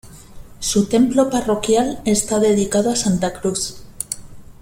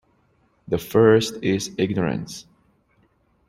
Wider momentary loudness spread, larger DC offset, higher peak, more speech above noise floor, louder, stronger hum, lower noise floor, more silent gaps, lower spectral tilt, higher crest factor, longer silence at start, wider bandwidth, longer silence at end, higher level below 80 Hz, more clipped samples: second, 12 LU vs 15 LU; neither; about the same, -2 dBFS vs -4 dBFS; second, 20 dB vs 43 dB; first, -18 LUFS vs -21 LUFS; neither; second, -37 dBFS vs -63 dBFS; neither; about the same, -4.5 dB/octave vs -5.5 dB/octave; about the same, 16 dB vs 20 dB; second, 0.05 s vs 0.7 s; about the same, 16.5 kHz vs 16 kHz; second, 0.1 s vs 1.1 s; first, -42 dBFS vs -56 dBFS; neither